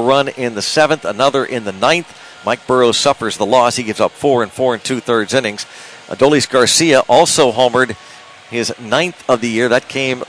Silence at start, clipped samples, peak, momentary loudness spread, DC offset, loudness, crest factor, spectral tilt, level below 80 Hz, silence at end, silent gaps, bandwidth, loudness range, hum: 0 s; under 0.1%; 0 dBFS; 10 LU; under 0.1%; -14 LUFS; 14 dB; -3 dB/octave; -54 dBFS; 0.05 s; none; 11 kHz; 2 LU; none